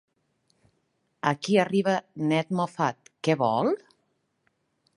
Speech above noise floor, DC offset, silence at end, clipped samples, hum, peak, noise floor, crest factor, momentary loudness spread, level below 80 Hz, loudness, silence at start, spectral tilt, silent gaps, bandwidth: 49 dB; under 0.1%; 1.2 s; under 0.1%; none; -6 dBFS; -74 dBFS; 22 dB; 6 LU; -74 dBFS; -26 LUFS; 1.25 s; -6 dB/octave; none; 11.5 kHz